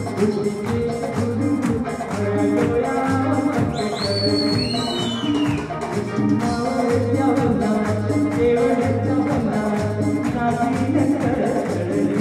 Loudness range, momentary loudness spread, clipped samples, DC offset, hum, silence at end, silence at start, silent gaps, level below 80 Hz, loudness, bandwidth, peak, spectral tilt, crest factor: 2 LU; 4 LU; under 0.1%; under 0.1%; none; 0 s; 0 s; none; -44 dBFS; -20 LUFS; 13.5 kHz; -6 dBFS; -6.5 dB/octave; 14 dB